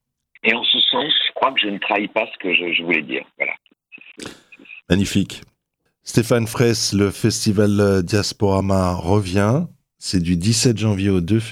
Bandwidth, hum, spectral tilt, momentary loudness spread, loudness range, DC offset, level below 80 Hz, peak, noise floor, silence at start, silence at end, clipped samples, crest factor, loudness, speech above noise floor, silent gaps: 15.5 kHz; none; -4.5 dB/octave; 11 LU; 5 LU; under 0.1%; -50 dBFS; 0 dBFS; -72 dBFS; 0.45 s; 0 s; under 0.1%; 20 dB; -18 LUFS; 53 dB; none